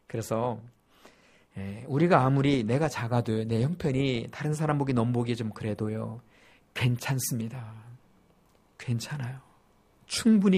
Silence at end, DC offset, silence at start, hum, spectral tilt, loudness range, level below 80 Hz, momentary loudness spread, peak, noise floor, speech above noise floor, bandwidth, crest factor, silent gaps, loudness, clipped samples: 0 s; under 0.1%; 0.1 s; none; -6 dB/octave; 7 LU; -58 dBFS; 17 LU; -6 dBFS; -63 dBFS; 36 dB; 15.5 kHz; 22 dB; none; -28 LUFS; under 0.1%